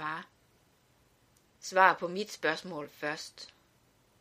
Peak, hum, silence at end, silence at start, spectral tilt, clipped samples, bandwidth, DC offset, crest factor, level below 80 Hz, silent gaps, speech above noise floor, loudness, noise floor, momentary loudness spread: -8 dBFS; none; 0.75 s; 0 s; -3 dB/octave; under 0.1%; 15.5 kHz; under 0.1%; 26 dB; -78 dBFS; none; 37 dB; -31 LUFS; -68 dBFS; 20 LU